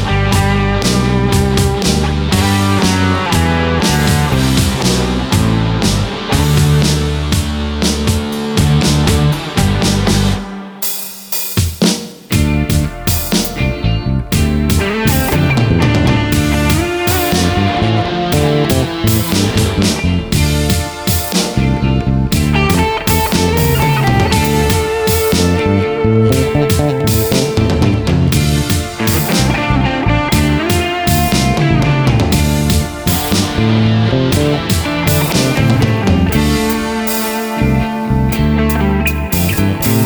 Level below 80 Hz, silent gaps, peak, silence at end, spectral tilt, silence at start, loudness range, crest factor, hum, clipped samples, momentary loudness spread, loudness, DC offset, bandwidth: -22 dBFS; none; 0 dBFS; 0 s; -5 dB/octave; 0 s; 2 LU; 12 dB; none; under 0.1%; 4 LU; -13 LUFS; under 0.1%; over 20 kHz